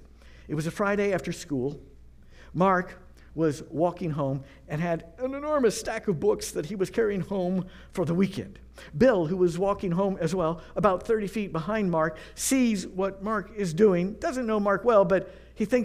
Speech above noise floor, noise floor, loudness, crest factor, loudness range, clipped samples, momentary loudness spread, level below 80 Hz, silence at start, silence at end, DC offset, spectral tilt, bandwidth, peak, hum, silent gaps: 23 dB; -50 dBFS; -27 LUFS; 20 dB; 4 LU; under 0.1%; 11 LU; -50 dBFS; 0.25 s; 0 s; under 0.1%; -6 dB/octave; 15.5 kHz; -8 dBFS; none; none